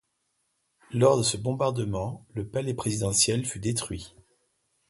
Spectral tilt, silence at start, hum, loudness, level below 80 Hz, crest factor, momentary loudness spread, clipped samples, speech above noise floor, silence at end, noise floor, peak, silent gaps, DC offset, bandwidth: -4.5 dB/octave; 0.9 s; none; -27 LUFS; -52 dBFS; 20 dB; 14 LU; under 0.1%; 49 dB; 0.8 s; -76 dBFS; -8 dBFS; none; under 0.1%; 12 kHz